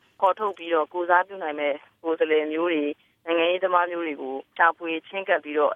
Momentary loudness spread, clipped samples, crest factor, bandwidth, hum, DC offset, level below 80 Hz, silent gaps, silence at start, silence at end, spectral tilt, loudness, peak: 9 LU; under 0.1%; 20 dB; 3.8 kHz; none; under 0.1%; -82 dBFS; none; 0.2 s; 0 s; -5.5 dB/octave; -25 LUFS; -6 dBFS